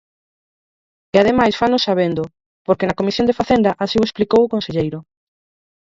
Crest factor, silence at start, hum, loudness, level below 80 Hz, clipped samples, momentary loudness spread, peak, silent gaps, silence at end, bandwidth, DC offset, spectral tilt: 18 dB; 1.15 s; none; -17 LUFS; -46 dBFS; under 0.1%; 10 LU; 0 dBFS; 2.46-2.65 s; 0.85 s; 7.8 kHz; under 0.1%; -6 dB/octave